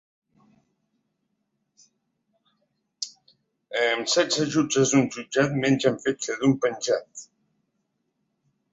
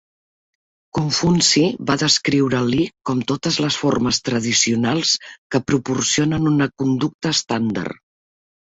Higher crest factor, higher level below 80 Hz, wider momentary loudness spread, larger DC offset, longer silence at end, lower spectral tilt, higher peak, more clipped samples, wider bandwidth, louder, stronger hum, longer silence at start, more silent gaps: about the same, 20 dB vs 16 dB; second, -66 dBFS vs -50 dBFS; first, 14 LU vs 8 LU; neither; first, 1.5 s vs 0.7 s; about the same, -4 dB/octave vs -4 dB/octave; second, -6 dBFS vs -2 dBFS; neither; about the same, 8 kHz vs 8.2 kHz; second, -24 LUFS vs -18 LUFS; neither; first, 3 s vs 0.95 s; second, none vs 5.38-5.50 s, 7.14-7.19 s